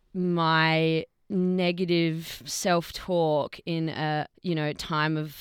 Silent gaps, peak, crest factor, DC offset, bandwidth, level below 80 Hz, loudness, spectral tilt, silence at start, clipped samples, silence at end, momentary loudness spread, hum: none; -10 dBFS; 16 dB; under 0.1%; 18.5 kHz; -58 dBFS; -27 LUFS; -5.5 dB/octave; 0.15 s; under 0.1%; 0 s; 8 LU; none